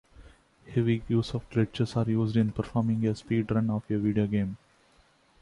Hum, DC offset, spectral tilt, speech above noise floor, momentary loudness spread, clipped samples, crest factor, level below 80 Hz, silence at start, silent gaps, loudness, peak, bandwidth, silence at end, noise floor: none; under 0.1%; -8.5 dB/octave; 36 dB; 4 LU; under 0.1%; 16 dB; -54 dBFS; 0.2 s; none; -28 LUFS; -12 dBFS; 11 kHz; 0.85 s; -63 dBFS